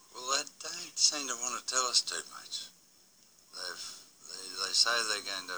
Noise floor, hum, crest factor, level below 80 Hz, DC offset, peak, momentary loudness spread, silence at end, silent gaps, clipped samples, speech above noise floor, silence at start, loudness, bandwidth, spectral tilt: -63 dBFS; none; 24 dB; -82 dBFS; under 0.1%; -10 dBFS; 17 LU; 0 s; none; under 0.1%; 31 dB; 0.1 s; -31 LUFS; over 20 kHz; 2 dB/octave